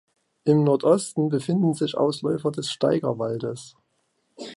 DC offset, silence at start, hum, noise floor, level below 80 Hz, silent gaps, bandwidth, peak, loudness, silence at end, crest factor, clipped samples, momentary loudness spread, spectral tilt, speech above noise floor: under 0.1%; 0.45 s; none; -71 dBFS; -68 dBFS; none; 11.5 kHz; -6 dBFS; -23 LUFS; 0 s; 18 dB; under 0.1%; 10 LU; -6.5 dB/octave; 49 dB